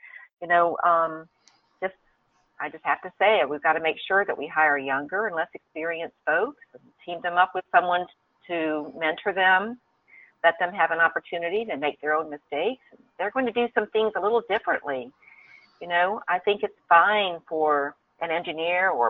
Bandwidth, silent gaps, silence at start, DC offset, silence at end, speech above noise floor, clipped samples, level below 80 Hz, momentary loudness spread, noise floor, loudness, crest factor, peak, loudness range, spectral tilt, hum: 4.9 kHz; 0.33-0.37 s; 0.05 s; under 0.1%; 0 s; 43 dB; under 0.1%; -72 dBFS; 13 LU; -67 dBFS; -25 LUFS; 20 dB; -4 dBFS; 3 LU; -6 dB/octave; none